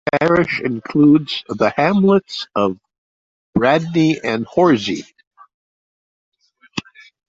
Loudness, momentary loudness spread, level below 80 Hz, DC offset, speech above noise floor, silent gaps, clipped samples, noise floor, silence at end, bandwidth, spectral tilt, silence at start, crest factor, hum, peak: -16 LUFS; 15 LU; -54 dBFS; under 0.1%; over 74 dB; 2.98-3.53 s, 5.27-5.31 s, 5.54-6.32 s; under 0.1%; under -90 dBFS; 0.45 s; 7.8 kHz; -6.5 dB/octave; 0.05 s; 16 dB; none; -2 dBFS